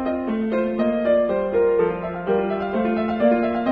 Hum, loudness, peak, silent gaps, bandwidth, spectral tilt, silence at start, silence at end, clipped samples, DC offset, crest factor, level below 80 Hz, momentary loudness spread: none; -21 LUFS; -6 dBFS; none; 5 kHz; -9.5 dB/octave; 0 s; 0 s; under 0.1%; under 0.1%; 14 dB; -48 dBFS; 5 LU